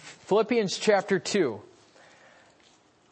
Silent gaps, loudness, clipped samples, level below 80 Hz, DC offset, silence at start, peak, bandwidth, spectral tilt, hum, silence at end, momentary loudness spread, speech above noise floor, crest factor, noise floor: none; -26 LUFS; under 0.1%; -78 dBFS; under 0.1%; 0.05 s; -10 dBFS; 8.8 kHz; -4 dB/octave; none; 1.5 s; 5 LU; 36 dB; 18 dB; -61 dBFS